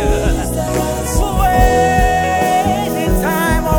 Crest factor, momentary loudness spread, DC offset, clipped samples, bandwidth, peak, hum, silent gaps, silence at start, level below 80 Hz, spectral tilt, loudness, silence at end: 14 dB; 6 LU; under 0.1%; under 0.1%; 19.5 kHz; 0 dBFS; none; none; 0 s; -20 dBFS; -5 dB/octave; -15 LUFS; 0 s